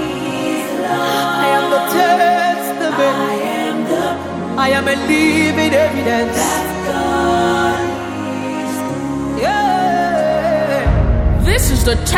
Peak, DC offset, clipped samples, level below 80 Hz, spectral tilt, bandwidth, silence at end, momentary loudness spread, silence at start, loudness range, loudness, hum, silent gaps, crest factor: 0 dBFS; under 0.1%; under 0.1%; -26 dBFS; -5 dB/octave; 18.5 kHz; 0 s; 8 LU; 0 s; 2 LU; -15 LUFS; none; none; 16 dB